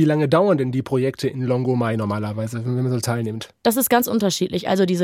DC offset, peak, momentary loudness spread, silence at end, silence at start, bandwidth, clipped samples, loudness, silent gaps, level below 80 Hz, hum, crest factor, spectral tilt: under 0.1%; -2 dBFS; 8 LU; 0 s; 0 s; 16.5 kHz; under 0.1%; -21 LUFS; none; -58 dBFS; none; 16 dB; -5.5 dB/octave